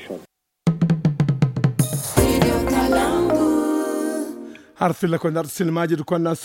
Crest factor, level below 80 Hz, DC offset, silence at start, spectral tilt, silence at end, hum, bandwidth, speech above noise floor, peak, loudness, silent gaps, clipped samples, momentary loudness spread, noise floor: 20 dB; -38 dBFS; under 0.1%; 0 s; -6 dB/octave; 0 s; none; 17 kHz; 24 dB; -2 dBFS; -20 LUFS; none; under 0.1%; 8 LU; -45 dBFS